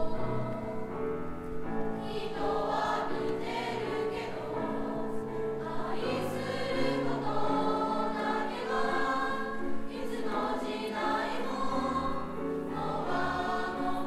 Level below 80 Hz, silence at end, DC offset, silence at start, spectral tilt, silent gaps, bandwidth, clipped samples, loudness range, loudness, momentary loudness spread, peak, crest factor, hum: -50 dBFS; 0 s; under 0.1%; 0 s; -6 dB/octave; none; 14 kHz; under 0.1%; 3 LU; -33 LUFS; 6 LU; -18 dBFS; 14 dB; none